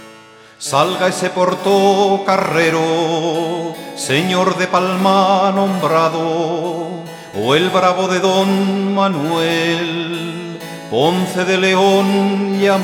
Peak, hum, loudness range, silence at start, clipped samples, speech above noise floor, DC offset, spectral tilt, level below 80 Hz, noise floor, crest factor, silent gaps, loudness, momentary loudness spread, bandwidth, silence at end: 0 dBFS; none; 1 LU; 0 s; under 0.1%; 27 dB; under 0.1%; -5 dB/octave; -62 dBFS; -41 dBFS; 16 dB; none; -15 LUFS; 11 LU; 17 kHz; 0 s